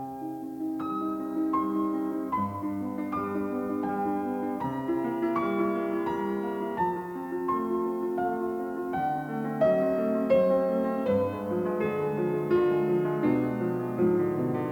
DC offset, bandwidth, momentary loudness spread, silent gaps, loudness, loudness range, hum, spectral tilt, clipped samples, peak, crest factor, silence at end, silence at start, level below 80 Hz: under 0.1%; 18.5 kHz; 7 LU; none; -29 LUFS; 4 LU; none; -8.5 dB/octave; under 0.1%; -12 dBFS; 14 dB; 0 s; 0 s; -64 dBFS